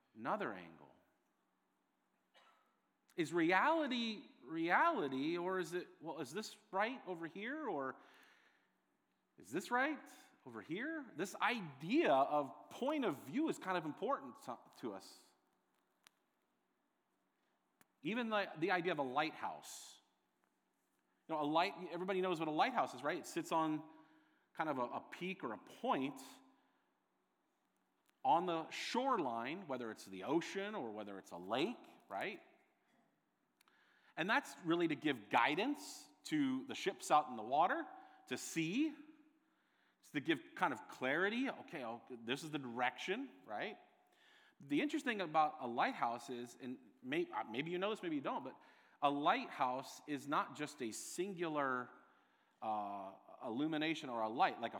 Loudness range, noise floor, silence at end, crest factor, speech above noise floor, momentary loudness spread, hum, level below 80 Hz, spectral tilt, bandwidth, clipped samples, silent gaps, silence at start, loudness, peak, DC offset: 7 LU; -84 dBFS; 0 s; 24 dB; 44 dB; 14 LU; none; under -90 dBFS; -4.5 dB/octave; over 20 kHz; under 0.1%; none; 0.15 s; -40 LUFS; -18 dBFS; under 0.1%